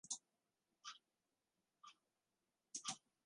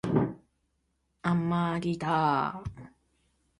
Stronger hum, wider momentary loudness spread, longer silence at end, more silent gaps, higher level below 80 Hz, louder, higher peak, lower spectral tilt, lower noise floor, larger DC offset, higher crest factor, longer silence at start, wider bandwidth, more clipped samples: neither; first, 17 LU vs 9 LU; second, 0.25 s vs 0.7 s; neither; second, under -90 dBFS vs -56 dBFS; second, -52 LUFS vs -29 LUFS; second, -30 dBFS vs -12 dBFS; second, 0.5 dB/octave vs -8 dB/octave; first, under -90 dBFS vs -76 dBFS; neither; first, 28 dB vs 20 dB; about the same, 0.05 s vs 0.05 s; about the same, 11 kHz vs 11 kHz; neither